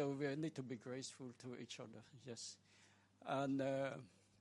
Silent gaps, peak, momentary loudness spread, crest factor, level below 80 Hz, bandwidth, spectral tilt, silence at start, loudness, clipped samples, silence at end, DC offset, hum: none; -28 dBFS; 16 LU; 18 dB; -88 dBFS; 11.5 kHz; -5.5 dB/octave; 0 s; -47 LUFS; under 0.1%; 0.35 s; under 0.1%; none